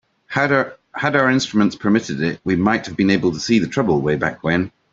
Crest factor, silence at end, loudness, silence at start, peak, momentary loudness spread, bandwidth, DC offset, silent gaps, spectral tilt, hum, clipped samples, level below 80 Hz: 18 dB; 0.25 s; -18 LUFS; 0.3 s; -2 dBFS; 5 LU; 7.8 kHz; under 0.1%; none; -5.5 dB/octave; none; under 0.1%; -52 dBFS